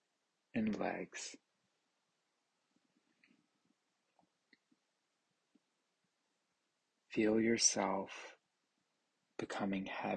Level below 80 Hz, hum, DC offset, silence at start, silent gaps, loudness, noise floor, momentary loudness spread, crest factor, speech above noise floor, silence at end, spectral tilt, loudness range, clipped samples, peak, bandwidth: -78 dBFS; none; under 0.1%; 0.55 s; none; -37 LUFS; -85 dBFS; 18 LU; 24 dB; 48 dB; 0 s; -3 dB/octave; 15 LU; under 0.1%; -18 dBFS; 9.4 kHz